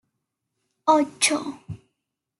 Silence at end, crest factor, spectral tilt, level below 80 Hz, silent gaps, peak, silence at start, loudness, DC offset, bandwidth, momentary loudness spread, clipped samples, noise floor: 0.65 s; 22 dB; -2.5 dB/octave; -66 dBFS; none; -4 dBFS; 0.85 s; -22 LUFS; under 0.1%; 12.5 kHz; 21 LU; under 0.1%; -81 dBFS